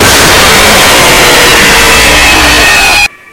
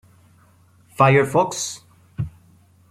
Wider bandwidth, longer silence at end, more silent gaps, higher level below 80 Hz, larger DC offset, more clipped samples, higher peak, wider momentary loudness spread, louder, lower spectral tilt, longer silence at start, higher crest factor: first, over 20 kHz vs 14.5 kHz; second, 0.25 s vs 0.6 s; neither; first, -18 dBFS vs -52 dBFS; neither; first, 7% vs under 0.1%; about the same, 0 dBFS vs -2 dBFS; second, 1 LU vs 20 LU; first, -1 LUFS vs -20 LUFS; second, -1.5 dB/octave vs -5 dB/octave; second, 0 s vs 1 s; second, 4 dB vs 20 dB